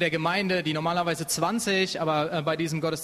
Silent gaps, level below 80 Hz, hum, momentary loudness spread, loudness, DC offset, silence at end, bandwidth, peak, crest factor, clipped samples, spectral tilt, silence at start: none; -62 dBFS; none; 3 LU; -26 LUFS; under 0.1%; 0 s; 13.5 kHz; -10 dBFS; 16 dB; under 0.1%; -4 dB/octave; 0 s